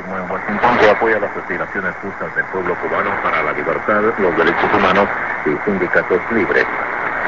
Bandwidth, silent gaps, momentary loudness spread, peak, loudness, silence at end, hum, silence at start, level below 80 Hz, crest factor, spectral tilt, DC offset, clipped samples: 7.6 kHz; none; 9 LU; 0 dBFS; -16 LUFS; 0 s; none; 0 s; -46 dBFS; 16 dB; -6.5 dB/octave; 0.8%; under 0.1%